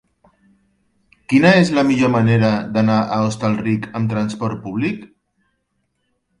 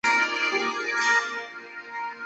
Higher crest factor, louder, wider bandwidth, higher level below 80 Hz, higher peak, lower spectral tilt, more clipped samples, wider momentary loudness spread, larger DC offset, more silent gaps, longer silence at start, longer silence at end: about the same, 18 dB vs 16 dB; first, -17 LUFS vs -24 LUFS; first, 11 kHz vs 8.2 kHz; first, -52 dBFS vs -76 dBFS; first, 0 dBFS vs -10 dBFS; first, -7 dB/octave vs -0.5 dB/octave; neither; second, 10 LU vs 15 LU; neither; neither; first, 1.3 s vs 0.05 s; first, 1.35 s vs 0 s